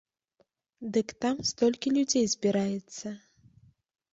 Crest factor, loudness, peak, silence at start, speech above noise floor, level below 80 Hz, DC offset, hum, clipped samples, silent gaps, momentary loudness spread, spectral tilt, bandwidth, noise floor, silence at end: 18 dB; -28 LUFS; -12 dBFS; 0.8 s; 44 dB; -68 dBFS; under 0.1%; none; under 0.1%; none; 15 LU; -4 dB/octave; 8.2 kHz; -72 dBFS; 0.95 s